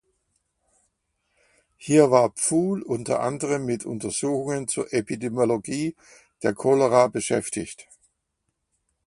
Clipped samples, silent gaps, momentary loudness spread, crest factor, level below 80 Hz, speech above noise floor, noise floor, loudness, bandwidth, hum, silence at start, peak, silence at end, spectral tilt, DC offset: under 0.1%; none; 11 LU; 22 dB; -62 dBFS; 54 dB; -77 dBFS; -23 LUFS; 11.5 kHz; none; 1.8 s; -2 dBFS; 1.25 s; -5 dB/octave; under 0.1%